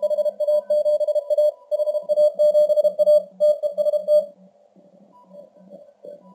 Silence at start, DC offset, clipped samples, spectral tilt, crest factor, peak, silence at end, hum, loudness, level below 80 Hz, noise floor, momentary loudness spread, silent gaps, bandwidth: 0 s; under 0.1%; under 0.1%; -4.5 dB/octave; 12 dB; -8 dBFS; 0.2 s; none; -20 LUFS; -86 dBFS; -53 dBFS; 6 LU; none; 13 kHz